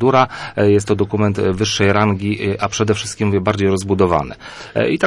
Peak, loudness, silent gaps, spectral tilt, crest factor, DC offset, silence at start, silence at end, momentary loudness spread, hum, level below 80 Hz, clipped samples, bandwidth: -2 dBFS; -17 LUFS; none; -5.5 dB/octave; 14 dB; under 0.1%; 0 s; 0 s; 6 LU; none; -46 dBFS; under 0.1%; 11.5 kHz